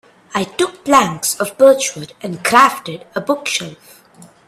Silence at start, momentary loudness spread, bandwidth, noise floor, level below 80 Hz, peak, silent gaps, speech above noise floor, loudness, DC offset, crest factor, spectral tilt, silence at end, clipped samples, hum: 0.35 s; 15 LU; 15.5 kHz; -45 dBFS; -58 dBFS; 0 dBFS; none; 29 dB; -15 LUFS; under 0.1%; 16 dB; -3 dB/octave; 0.75 s; under 0.1%; none